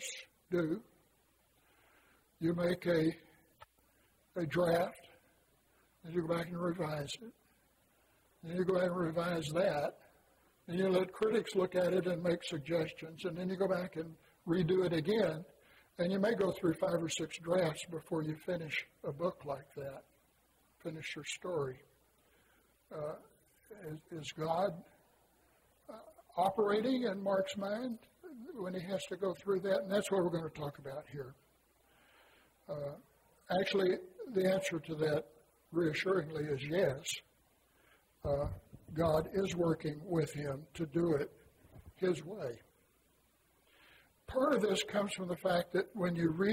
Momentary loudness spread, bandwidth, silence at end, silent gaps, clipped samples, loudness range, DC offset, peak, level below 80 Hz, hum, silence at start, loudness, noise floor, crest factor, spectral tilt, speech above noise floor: 14 LU; 16 kHz; 0 s; none; under 0.1%; 8 LU; under 0.1%; -18 dBFS; -64 dBFS; none; 0 s; -36 LUFS; -73 dBFS; 18 dB; -5.5 dB/octave; 37 dB